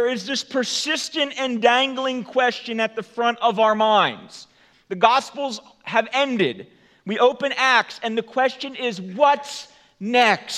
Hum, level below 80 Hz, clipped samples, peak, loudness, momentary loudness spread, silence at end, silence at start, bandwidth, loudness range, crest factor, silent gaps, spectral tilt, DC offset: none; -76 dBFS; under 0.1%; 0 dBFS; -20 LUFS; 12 LU; 0 s; 0 s; 13.5 kHz; 2 LU; 20 dB; none; -3 dB/octave; under 0.1%